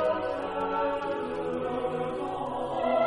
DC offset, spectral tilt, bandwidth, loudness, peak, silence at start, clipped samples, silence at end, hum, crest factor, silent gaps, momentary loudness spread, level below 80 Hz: under 0.1%; -6.5 dB/octave; 10.5 kHz; -31 LUFS; -16 dBFS; 0 s; under 0.1%; 0 s; none; 14 dB; none; 4 LU; -56 dBFS